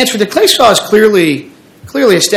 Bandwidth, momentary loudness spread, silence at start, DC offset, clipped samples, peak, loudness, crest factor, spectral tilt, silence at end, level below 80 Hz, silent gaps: over 20 kHz; 9 LU; 0 s; under 0.1%; 2%; 0 dBFS; -9 LUFS; 10 dB; -3 dB/octave; 0 s; -46 dBFS; none